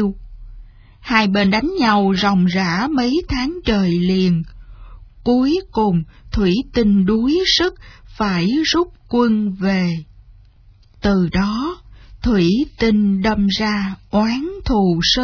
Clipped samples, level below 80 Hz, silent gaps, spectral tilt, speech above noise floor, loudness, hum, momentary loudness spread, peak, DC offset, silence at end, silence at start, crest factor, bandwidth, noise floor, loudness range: under 0.1%; -34 dBFS; none; -6 dB/octave; 31 dB; -17 LUFS; none; 8 LU; 0 dBFS; under 0.1%; 0 s; 0 s; 16 dB; 5.4 kHz; -48 dBFS; 3 LU